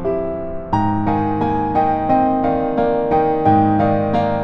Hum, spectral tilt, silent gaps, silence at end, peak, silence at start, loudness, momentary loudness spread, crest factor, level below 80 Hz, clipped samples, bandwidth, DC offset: none; -9.5 dB/octave; none; 0 s; -4 dBFS; 0 s; -17 LUFS; 7 LU; 14 dB; -38 dBFS; under 0.1%; 6.2 kHz; under 0.1%